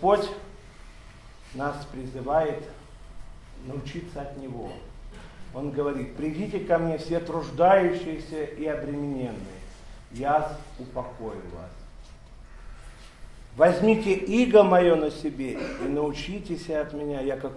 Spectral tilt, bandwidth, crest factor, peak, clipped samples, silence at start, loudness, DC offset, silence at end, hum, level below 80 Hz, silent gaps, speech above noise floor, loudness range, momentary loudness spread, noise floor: -6.5 dB/octave; 12 kHz; 22 dB; -6 dBFS; under 0.1%; 0 s; -26 LUFS; under 0.1%; 0 s; none; -46 dBFS; none; 21 dB; 12 LU; 23 LU; -47 dBFS